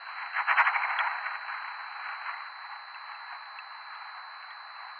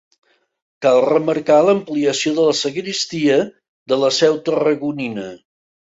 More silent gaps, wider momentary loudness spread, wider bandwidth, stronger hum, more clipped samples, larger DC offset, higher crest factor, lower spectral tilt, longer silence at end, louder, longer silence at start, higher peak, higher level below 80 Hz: second, none vs 3.68-3.86 s; first, 18 LU vs 10 LU; second, 6.6 kHz vs 8 kHz; neither; neither; neither; first, 24 dB vs 16 dB; second, 0.5 dB/octave vs -4 dB/octave; second, 0 s vs 0.6 s; second, -31 LUFS vs -17 LUFS; second, 0 s vs 0.8 s; second, -10 dBFS vs -2 dBFS; second, under -90 dBFS vs -62 dBFS